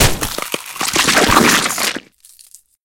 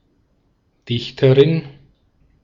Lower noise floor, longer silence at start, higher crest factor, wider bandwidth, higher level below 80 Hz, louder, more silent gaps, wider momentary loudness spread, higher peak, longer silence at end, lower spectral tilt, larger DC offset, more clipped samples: second, -46 dBFS vs -62 dBFS; second, 0 s vs 0.9 s; about the same, 16 dB vs 18 dB; first, 17.5 kHz vs 7.2 kHz; first, -32 dBFS vs -54 dBFS; about the same, -14 LUFS vs -16 LUFS; neither; about the same, 12 LU vs 12 LU; about the same, 0 dBFS vs -2 dBFS; about the same, 0.85 s vs 0.75 s; second, -2.5 dB/octave vs -8 dB/octave; neither; neither